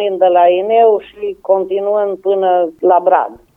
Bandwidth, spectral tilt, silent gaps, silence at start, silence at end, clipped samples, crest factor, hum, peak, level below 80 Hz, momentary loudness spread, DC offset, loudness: 3.8 kHz; -7.5 dB/octave; none; 0 s; 0.2 s; under 0.1%; 12 dB; none; 0 dBFS; -58 dBFS; 6 LU; under 0.1%; -13 LUFS